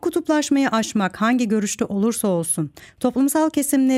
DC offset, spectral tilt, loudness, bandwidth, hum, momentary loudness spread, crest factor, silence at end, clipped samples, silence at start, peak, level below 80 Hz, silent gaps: under 0.1%; -4.5 dB/octave; -20 LUFS; 16 kHz; none; 5 LU; 12 dB; 0 s; under 0.1%; 0.05 s; -8 dBFS; -60 dBFS; none